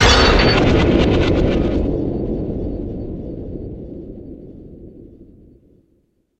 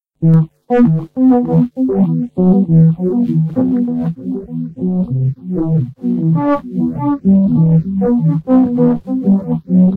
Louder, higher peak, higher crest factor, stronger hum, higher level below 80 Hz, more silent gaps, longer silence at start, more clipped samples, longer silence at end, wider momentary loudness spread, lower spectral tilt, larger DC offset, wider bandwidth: second, -17 LUFS vs -14 LUFS; about the same, 0 dBFS vs 0 dBFS; first, 18 dB vs 12 dB; neither; first, -24 dBFS vs -44 dBFS; neither; second, 0 s vs 0.2 s; neither; first, 1.15 s vs 0 s; first, 23 LU vs 8 LU; second, -5.5 dB/octave vs -12.5 dB/octave; neither; first, 9.2 kHz vs 3.1 kHz